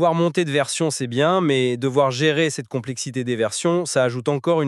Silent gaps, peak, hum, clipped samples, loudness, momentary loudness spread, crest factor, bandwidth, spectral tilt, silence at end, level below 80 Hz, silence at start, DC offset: none; -4 dBFS; none; under 0.1%; -21 LUFS; 7 LU; 16 dB; 13 kHz; -5 dB/octave; 0 s; -70 dBFS; 0 s; under 0.1%